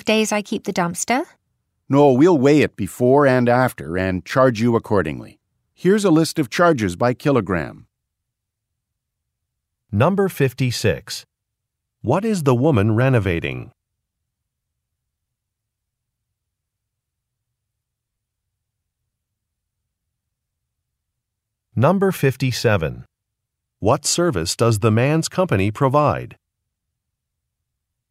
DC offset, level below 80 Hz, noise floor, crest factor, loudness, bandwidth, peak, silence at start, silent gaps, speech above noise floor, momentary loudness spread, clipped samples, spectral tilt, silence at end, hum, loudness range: under 0.1%; -50 dBFS; -80 dBFS; 18 dB; -18 LUFS; 16 kHz; -2 dBFS; 0.05 s; none; 63 dB; 10 LU; under 0.1%; -6 dB/octave; 1.8 s; none; 7 LU